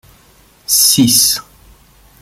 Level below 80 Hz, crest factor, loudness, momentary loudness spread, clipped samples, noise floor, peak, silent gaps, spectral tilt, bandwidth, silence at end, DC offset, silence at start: -48 dBFS; 16 dB; -10 LUFS; 12 LU; under 0.1%; -48 dBFS; 0 dBFS; none; -1.5 dB/octave; over 20 kHz; 0.8 s; under 0.1%; 0.7 s